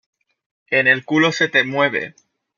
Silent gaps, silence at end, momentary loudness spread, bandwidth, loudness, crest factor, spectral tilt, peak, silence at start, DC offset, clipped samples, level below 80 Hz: none; 0.5 s; 8 LU; 7.2 kHz; -17 LUFS; 18 dB; -4.5 dB/octave; -2 dBFS; 0.7 s; under 0.1%; under 0.1%; -70 dBFS